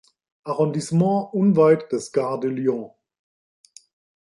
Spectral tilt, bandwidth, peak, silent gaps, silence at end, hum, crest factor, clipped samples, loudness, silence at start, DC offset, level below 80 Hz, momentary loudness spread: -7.5 dB/octave; 11.5 kHz; -4 dBFS; none; 1.4 s; none; 18 dB; under 0.1%; -21 LUFS; 0.45 s; under 0.1%; -68 dBFS; 13 LU